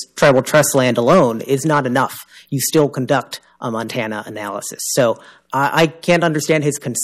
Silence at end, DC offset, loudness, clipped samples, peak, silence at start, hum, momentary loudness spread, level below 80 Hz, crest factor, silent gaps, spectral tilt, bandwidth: 0 s; under 0.1%; -17 LUFS; under 0.1%; -4 dBFS; 0 s; none; 13 LU; -54 dBFS; 12 dB; none; -4.5 dB/octave; 15.5 kHz